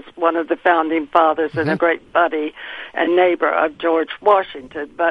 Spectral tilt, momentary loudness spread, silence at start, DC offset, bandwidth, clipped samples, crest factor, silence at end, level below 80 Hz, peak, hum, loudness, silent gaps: -7.5 dB/octave; 12 LU; 0.05 s; under 0.1%; 5.4 kHz; under 0.1%; 18 dB; 0 s; -58 dBFS; 0 dBFS; none; -18 LUFS; none